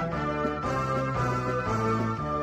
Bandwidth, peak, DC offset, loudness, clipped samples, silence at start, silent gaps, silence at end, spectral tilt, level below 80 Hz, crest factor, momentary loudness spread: 13 kHz; -14 dBFS; under 0.1%; -28 LUFS; under 0.1%; 0 s; none; 0 s; -7 dB/octave; -46 dBFS; 14 dB; 2 LU